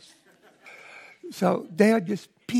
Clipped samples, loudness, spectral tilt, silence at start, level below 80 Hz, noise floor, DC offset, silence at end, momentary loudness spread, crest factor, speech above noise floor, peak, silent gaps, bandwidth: under 0.1%; -24 LUFS; -6.5 dB/octave; 0.65 s; -76 dBFS; -58 dBFS; under 0.1%; 0 s; 24 LU; 22 dB; 35 dB; -6 dBFS; none; 14.5 kHz